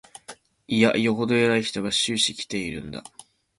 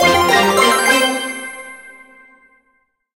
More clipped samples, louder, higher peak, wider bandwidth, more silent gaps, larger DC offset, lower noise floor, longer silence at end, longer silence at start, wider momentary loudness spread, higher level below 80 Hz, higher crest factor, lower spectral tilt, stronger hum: neither; second, -23 LUFS vs -13 LUFS; second, -4 dBFS vs 0 dBFS; second, 11.5 kHz vs 16 kHz; neither; neither; second, -47 dBFS vs -63 dBFS; second, 0.6 s vs 1.25 s; first, 0.3 s vs 0 s; about the same, 18 LU vs 19 LU; second, -56 dBFS vs -48 dBFS; first, 22 dB vs 16 dB; first, -3.5 dB/octave vs -2 dB/octave; neither